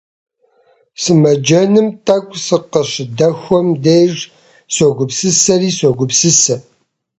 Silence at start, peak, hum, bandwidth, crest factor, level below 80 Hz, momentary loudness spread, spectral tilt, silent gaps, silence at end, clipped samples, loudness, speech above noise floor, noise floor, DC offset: 1 s; 0 dBFS; none; 8.8 kHz; 14 dB; -54 dBFS; 8 LU; -4 dB/octave; none; 0.6 s; under 0.1%; -12 LUFS; 42 dB; -54 dBFS; under 0.1%